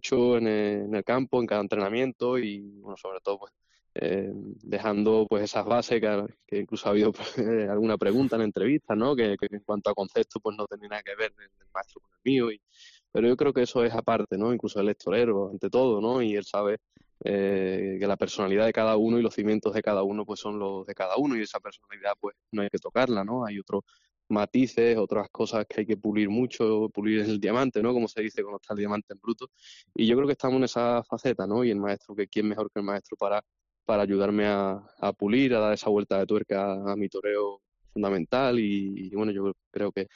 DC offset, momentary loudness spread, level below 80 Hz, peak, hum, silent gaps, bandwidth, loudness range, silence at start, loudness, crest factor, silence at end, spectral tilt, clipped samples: under 0.1%; 10 LU; -66 dBFS; -12 dBFS; none; 2.15-2.19 s, 25.30-25.34 s, 29.03-29.08 s, 39.66-39.71 s; 7.4 kHz; 4 LU; 0.05 s; -27 LUFS; 14 dB; 0.1 s; -5 dB/octave; under 0.1%